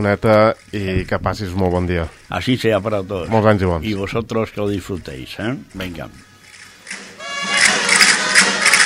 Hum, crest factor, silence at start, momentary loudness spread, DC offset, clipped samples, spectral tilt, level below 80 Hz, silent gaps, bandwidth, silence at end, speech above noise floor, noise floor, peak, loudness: none; 18 dB; 0 s; 17 LU; under 0.1%; under 0.1%; -3.5 dB/octave; -40 dBFS; none; 16 kHz; 0 s; 23 dB; -42 dBFS; 0 dBFS; -16 LUFS